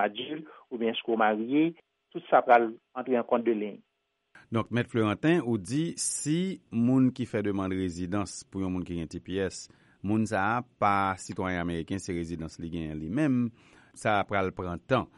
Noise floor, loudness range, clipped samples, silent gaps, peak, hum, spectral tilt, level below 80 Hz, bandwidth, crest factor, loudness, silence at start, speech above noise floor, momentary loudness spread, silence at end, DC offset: -62 dBFS; 4 LU; under 0.1%; none; -8 dBFS; none; -5.5 dB/octave; -58 dBFS; 11.5 kHz; 22 dB; -29 LUFS; 0 s; 34 dB; 11 LU; 0.1 s; under 0.1%